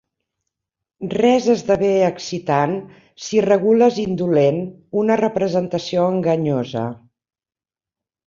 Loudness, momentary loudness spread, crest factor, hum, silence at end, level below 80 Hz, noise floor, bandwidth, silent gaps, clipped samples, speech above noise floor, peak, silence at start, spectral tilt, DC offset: -18 LUFS; 11 LU; 16 dB; none; 1.3 s; -58 dBFS; under -90 dBFS; 7.6 kHz; none; under 0.1%; over 72 dB; -2 dBFS; 1 s; -6.5 dB/octave; under 0.1%